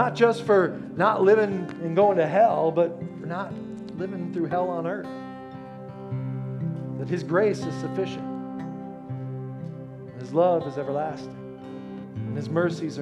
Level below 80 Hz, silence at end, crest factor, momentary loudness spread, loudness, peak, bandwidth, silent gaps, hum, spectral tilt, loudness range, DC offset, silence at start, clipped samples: -66 dBFS; 0 s; 18 dB; 18 LU; -25 LUFS; -6 dBFS; 10.5 kHz; none; none; -7.5 dB/octave; 9 LU; under 0.1%; 0 s; under 0.1%